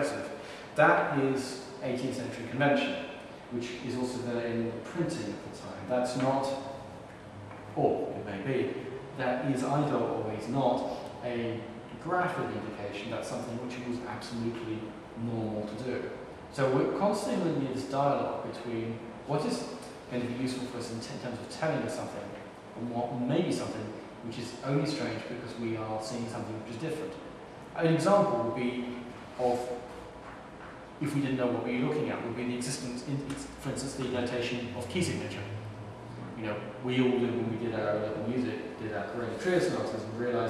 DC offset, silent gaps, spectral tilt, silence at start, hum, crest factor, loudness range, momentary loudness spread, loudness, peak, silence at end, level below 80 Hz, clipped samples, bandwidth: under 0.1%; none; -6 dB/octave; 0 s; none; 22 dB; 4 LU; 13 LU; -33 LUFS; -10 dBFS; 0 s; -62 dBFS; under 0.1%; 13.5 kHz